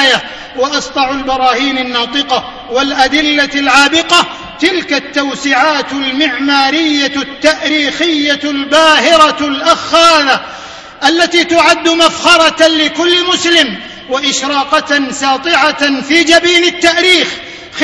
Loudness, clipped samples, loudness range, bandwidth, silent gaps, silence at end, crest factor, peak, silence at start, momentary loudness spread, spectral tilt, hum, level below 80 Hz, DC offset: -9 LUFS; 1%; 3 LU; 11 kHz; none; 0 s; 10 dB; 0 dBFS; 0 s; 8 LU; -1.5 dB/octave; none; -44 dBFS; under 0.1%